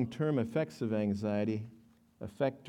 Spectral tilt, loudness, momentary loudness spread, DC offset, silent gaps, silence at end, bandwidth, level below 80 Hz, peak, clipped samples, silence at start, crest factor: -8 dB/octave; -34 LUFS; 16 LU; under 0.1%; none; 0 s; 11.5 kHz; -72 dBFS; -20 dBFS; under 0.1%; 0 s; 14 dB